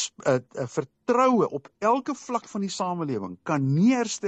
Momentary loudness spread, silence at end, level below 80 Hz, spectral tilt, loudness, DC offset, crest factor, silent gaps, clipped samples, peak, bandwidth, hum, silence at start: 10 LU; 0 s; -70 dBFS; -5.5 dB/octave; -25 LUFS; under 0.1%; 16 dB; none; under 0.1%; -10 dBFS; 8.8 kHz; none; 0 s